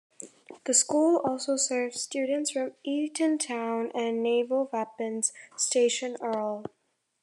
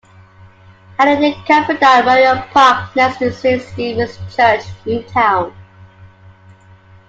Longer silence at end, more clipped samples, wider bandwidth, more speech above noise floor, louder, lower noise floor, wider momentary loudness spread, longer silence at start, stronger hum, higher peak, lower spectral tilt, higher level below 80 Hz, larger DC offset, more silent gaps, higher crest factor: second, 0.55 s vs 1 s; neither; first, 12.5 kHz vs 8.4 kHz; second, 20 dB vs 30 dB; second, -28 LUFS vs -13 LUFS; first, -48 dBFS vs -44 dBFS; about the same, 10 LU vs 11 LU; second, 0.2 s vs 1 s; neither; second, -8 dBFS vs 0 dBFS; second, -2 dB/octave vs -5 dB/octave; second, -84 dBFS vs -50 dBFS; neither; neither; about the same, 20 dB vs 16 dB